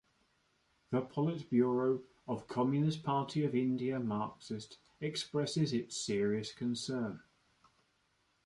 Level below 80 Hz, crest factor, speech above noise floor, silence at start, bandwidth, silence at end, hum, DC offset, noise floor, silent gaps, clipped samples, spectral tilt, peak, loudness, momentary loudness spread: -72 dBFS; 18 dB; 41 dB; 0.9 s; 11.5 kHz; 1.25 s; none; under 0.1%; -76 dBFS; none; under 0.1%; -6 dB/octave; -18 dBFS; -36 LUFS; 10 LU